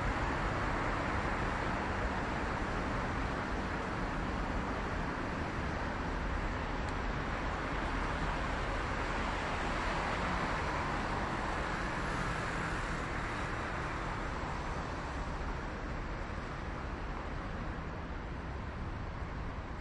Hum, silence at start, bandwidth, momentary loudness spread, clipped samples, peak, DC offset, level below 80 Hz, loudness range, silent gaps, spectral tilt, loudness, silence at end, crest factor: none; 0 s; 11.5 kHz; 7 LU; under 0.1%; -22 dBFS; under 0.1%; -42 dBFS; 5 LU; none; -5.5 dB/octave; -37 LUFS; 0 s; 14 dB